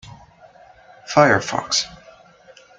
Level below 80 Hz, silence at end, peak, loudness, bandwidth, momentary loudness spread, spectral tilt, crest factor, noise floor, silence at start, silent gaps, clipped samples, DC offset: -56 dBFS; 0.85 s; -2 dBFS; -18 LUFS; 9.4 kHz; 6 LU; -3.5 dB/octave; 22 dB; -49 dBFS; 0.1 s; none; under 0.1%; under 0.1%